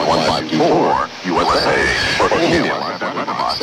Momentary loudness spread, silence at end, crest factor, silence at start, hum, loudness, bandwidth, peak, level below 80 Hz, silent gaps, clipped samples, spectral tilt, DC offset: 7 LU; 0 s; 14 dB; 0 s; none; -16 LUFS; 17 kHz; -2 dBFS; -40 dBFS; none; under 0.1%; -4 dB/octave; under 0.1%